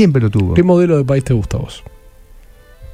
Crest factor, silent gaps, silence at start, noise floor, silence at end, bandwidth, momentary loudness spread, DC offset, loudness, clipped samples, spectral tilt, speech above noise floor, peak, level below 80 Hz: 14 dB; none; 0 s; -40 dBFS; 0.1 s; 11 kHz; 14 LU; under 0.1%; -14 LUFS; under 0.1%; -8 dB/octave; 28 dB; 0 dBFS; -32 dBFS